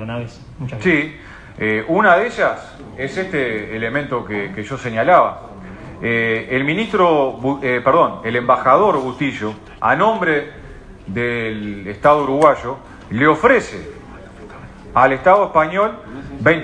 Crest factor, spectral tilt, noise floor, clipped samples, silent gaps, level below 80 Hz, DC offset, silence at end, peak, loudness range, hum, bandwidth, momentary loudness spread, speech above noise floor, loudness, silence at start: 18 dB; -6.5 dB/octave; -36 dBFS; under 0.1%; none; -44 dBFS; under 0.1%; 0 s; 0 dBFS; 3 LU; none; 10.5 kHz; 20 LU; 20 dB; -17 LUFS; 0 s